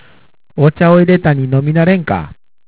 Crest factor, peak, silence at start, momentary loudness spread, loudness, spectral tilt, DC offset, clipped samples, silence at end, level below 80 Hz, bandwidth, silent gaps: 12 dB; 0 dBFS; 0.55 s; 11 LU; -12 LUFS; -12 dB/octave; 0.7%; under 0.1%; 0.35 s; -40 dBFS; 4 kHz; none